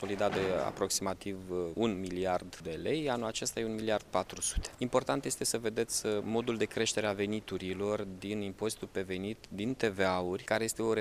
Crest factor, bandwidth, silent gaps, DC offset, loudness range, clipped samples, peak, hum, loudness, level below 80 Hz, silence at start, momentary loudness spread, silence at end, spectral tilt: 20 dB; 15.5 kHz; none; under 0.1%; 2 LU; under 0.1%; -14 dBFS; none; -34 LUFS; -54 dBFS; 0 s; 7 LU; 0 s; -4 dB/octave